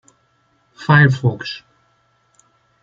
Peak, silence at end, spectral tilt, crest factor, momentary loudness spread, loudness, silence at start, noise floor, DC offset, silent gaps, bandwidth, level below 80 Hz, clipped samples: -2 dBFS; 1.25 s; -7 dB/octave; 18 dB; 17 LU; -16 LUFS; 0.8 s; -61 dBFS; under 0.1%; none; 7.6 kHz; -56 dBFS; under 0.1%